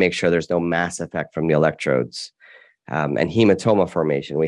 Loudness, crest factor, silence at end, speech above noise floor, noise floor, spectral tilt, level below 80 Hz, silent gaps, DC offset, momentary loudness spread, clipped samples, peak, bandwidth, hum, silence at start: -20 LUFS; 18 dB; 0 s; 30 dB; -50 dBFS; -6 dB/octave; -56 dBFS; none; under 0.1%; 11 LU; under 0.1%; -4 dBFS; 11.5 kHz; none; 0 s